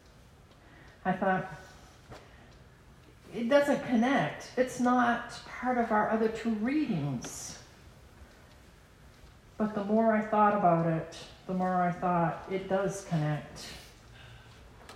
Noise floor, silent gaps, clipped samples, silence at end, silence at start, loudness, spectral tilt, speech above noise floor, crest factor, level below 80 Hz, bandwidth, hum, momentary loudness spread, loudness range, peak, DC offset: -56 dBFS; none; under 0.1%; 0 s; 0.75 s; -30 LUFS; -6 dB/octave; 27 dB; 18 dB; -60 dBFS; 15 kHz; none; 19 LU; 8 LU; -12 dBFS; under 0.1%